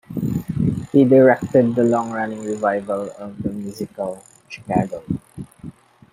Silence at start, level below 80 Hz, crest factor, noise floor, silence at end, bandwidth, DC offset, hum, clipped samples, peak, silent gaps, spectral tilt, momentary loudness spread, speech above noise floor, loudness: 0.1 s; -48 dBFS; 18 dB; -40 dBFS; 0.4 s; 16 kHz; under 0.1%; none; under 0.1%; -2 dBFS; none; -8 dB/octave; 23 LU; 21 dB; -20 LUFS